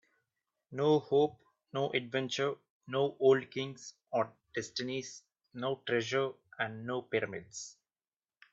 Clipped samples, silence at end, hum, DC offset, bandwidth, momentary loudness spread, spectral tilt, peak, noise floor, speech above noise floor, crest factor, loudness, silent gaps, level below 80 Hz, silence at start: under 0.1%; 0.8 s; none; under 0.1%; 7.8 kHz; 17 LU; -5 dB/octave; -16 dBFS; under -90 dBFS; over 57 dB; 20 dB; -34 LUFS; 2.70-2.80 s; -78 dBFS; 0.7 s